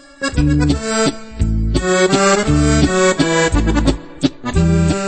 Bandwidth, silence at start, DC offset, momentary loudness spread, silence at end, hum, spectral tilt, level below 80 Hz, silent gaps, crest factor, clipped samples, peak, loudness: 8.8 kHz; 0.2 s; under 0.1%; 7 LU; 0 s; none; -5 dB/octave; -22 dBFS; none; 14 dB; under 0.1%; -2 dBFS; -15 LUFS